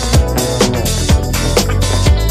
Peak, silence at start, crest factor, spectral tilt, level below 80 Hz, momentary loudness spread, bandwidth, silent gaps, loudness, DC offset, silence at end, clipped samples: 0 dBFS; 0 s; 12 dB; -4.5 dB/octave; -16 dBFS; 2 LU; 15.5 kHz; none; -14 LUFS; under 0.1%; 0 s; under 0.1%